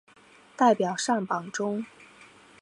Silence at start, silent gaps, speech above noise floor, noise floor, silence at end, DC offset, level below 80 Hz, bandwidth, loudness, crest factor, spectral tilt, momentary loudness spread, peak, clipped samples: 0.6 s; none; 30 dB; -56 dBFS; 0.35 s; under 0.1%; -78 dBFS; 11 kHz; -26 LUFS; 22 dB; -4.5 dB/octave; 11 LU; -8 dBFS; under 0.1%